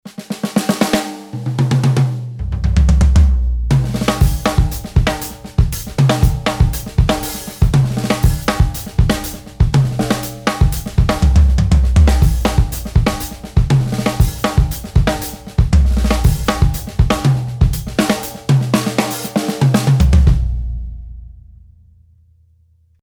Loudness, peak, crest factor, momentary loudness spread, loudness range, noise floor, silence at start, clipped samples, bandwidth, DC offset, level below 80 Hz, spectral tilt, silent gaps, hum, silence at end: -16 LUFS; 0 dBFS; 14 dB; 8 LU; 2 LU; -53 dBFS; 0.05 s; under 0.1%; over 20 kHz; under 0.1%; -18 dBFS; -6 dB/octave; none; none; 1.6 s